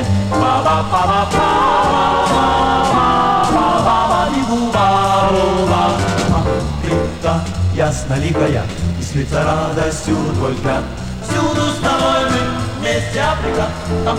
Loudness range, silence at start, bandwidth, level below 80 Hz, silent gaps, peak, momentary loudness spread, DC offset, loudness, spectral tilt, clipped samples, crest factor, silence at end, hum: 4 LU; 0 s; 15 kHz; -30 dBFS; none; -2 dBFS; 6 LU; under 0.1%; -15 LUFS; -5.5 dB/octave; under 0.1%; 14 dB; 0 s; none